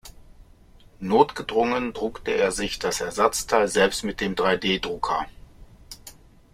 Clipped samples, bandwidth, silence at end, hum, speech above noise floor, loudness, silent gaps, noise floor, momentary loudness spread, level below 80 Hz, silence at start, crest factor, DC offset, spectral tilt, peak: under 0.1%; 16 kHz; 0.4 s; none; 28 dB; -23 LUFS; none; -51 dBFS; 16 LU; -48 dBFS; 0.05 s; 22 dB; under 0.1%; -3.5 dB/octave; -2 dBFS